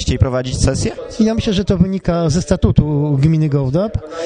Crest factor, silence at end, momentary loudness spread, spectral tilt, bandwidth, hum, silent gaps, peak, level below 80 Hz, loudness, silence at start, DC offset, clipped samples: 16 dB; 0 s; 4 LU; -6.5 dB/octave; 10 kHz; none; none; 0 dBFS; -26 dBFS; -16 LUFS; 0 s; under 0.1%; under 0.1%